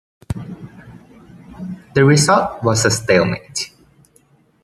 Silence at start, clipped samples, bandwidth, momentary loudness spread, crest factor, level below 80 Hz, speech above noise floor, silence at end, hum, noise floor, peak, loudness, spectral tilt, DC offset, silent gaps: 0.3 s; under 0.1%; 14 kHz; 21 LU; 18 dB; -48 dBFS; 39 dB; 0.95 s; none; -55 dBFS; -2 dBFS; -16 LUFS; -4.5 dB/octave; under 0.1%; none